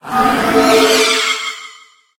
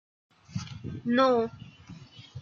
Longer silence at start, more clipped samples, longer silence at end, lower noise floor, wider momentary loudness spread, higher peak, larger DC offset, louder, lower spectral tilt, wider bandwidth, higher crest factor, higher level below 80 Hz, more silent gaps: second, 0.05 s vs 0.5 s; neither; first, 0.45 s vs 0 s; second, -43 dBFS vs -49 dBFS; second, 12 LU vs 25 LU; first, 0 dBFS vs -10 dBFS; neither; first, -12 LUFS vs -28 LUFS; second, -2 dB/octave vs -6.5 dB/octave; first, 17 kHz vs 7.4 kHz; second, 14 dB vs 20 dB; first, -44 dBFS vs -64 dBFS; neither